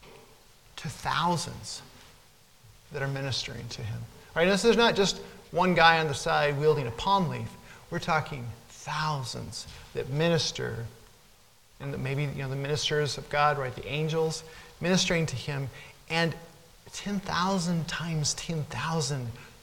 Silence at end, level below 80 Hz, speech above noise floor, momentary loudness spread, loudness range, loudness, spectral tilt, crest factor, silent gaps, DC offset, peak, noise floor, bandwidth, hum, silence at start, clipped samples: 0.1 s; -52 dBFS; 31 dB; 16 LU; 8 LU; -28 LUFS; -4.5 dB/octave; 24 dB; none; under 0.1%; -6 dBFS; -59 dBFS; 17.5 kHz; none; 0.05 s; under 0.1%